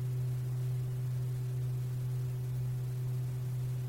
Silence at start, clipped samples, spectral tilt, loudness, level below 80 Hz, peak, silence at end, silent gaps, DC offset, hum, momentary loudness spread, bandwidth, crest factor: 0 s; under 0.1%; -8 dB/octave; -36 LUFS; -56 dBFS; -28 dBFS; 0 s; none; under 0.1%; none; 1 LU; 16 kHz; 6 dB